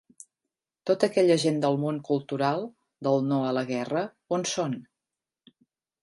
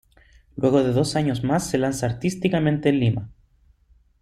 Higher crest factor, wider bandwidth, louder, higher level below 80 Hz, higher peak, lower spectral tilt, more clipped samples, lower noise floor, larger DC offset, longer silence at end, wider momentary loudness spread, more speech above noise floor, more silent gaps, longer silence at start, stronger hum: about the same, 20 dB vs 18 dB; second, 11.5 kHz vs 13.5 kHz; second, -27 LUFS vs -22 LUFS; second, -74 dBFS vs -50 dBFS; about the same, -8 dBFS vs -6 dBFS; about the same, -5.5 dB/octave vs -6.5 dB/octave; neither; first, -89 dBFS vs -59 dBFS; neither; first, 1.2 s vs 0.9 s; first, 11 LU vs 5 LU; first, 63 dB vs 37 dB; neither; first, 0.85 s vs 0.55 s; neither